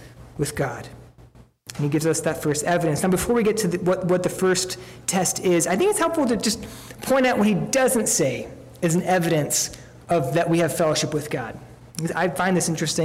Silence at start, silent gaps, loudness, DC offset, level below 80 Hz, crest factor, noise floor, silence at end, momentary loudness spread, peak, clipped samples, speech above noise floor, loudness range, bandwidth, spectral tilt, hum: 0 s; none; -22 LUFS; under 0.1%; -50 dBFS; 12 dB; -50 dBFS; 0 s; 12 LU; -12 dBFS; under 0.1%; 28 dB; 3 LU; 16 kHz; -4.5 dB/octave; none